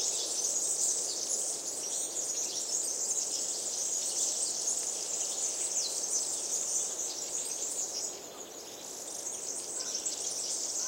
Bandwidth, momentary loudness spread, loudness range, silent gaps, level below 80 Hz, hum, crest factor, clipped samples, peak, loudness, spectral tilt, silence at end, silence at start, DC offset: 16 kHz; 7 LU; 4 LU; none; -78 dBFS; none; 16 dB; under 0.1%; -18 dBFS; -31 LUFS; 1.5 dB/octave; 0 s; 0 s; under 0.1%